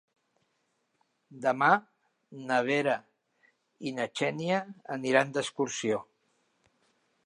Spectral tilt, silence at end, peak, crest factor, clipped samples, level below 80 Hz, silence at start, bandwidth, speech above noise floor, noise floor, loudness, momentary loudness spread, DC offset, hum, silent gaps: -4.5 dB/octave; 1.25 s; -8 dBFS; 24 dB; under 0.1%; -82 dBFS; 1.3 s; 11.5 kHz; 47 dB; -76 dBFS; -29 LUFS; 11 LU; under 0.1%; none; none